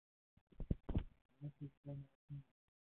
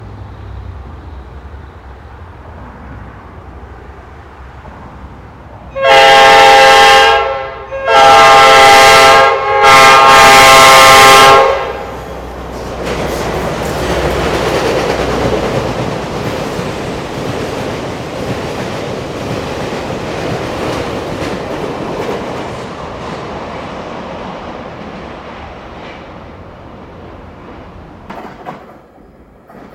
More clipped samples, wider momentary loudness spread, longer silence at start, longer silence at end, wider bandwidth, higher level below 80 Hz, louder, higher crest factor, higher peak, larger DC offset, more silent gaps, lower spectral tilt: second, under 0.1% vs 1%; second, 12 LU vs 26 LU; first, 0.6 s vs 0 s; first, 0.45 s vs 0.1 s; second, 4 kHz vs over 20 kHz; second, -54 dBFS vs -32 dBFS; second, -50 LUFS vs -7 LUFS; first, 24 dB vs 12 dB; second, -24 dBFS vs 0 dBFS; neither; first, 1.25-1.29 s, 1.77-1.84 s, 2.15-2.28 s vs none; first, -9.5 dB/octave vs -2.5 dB/octave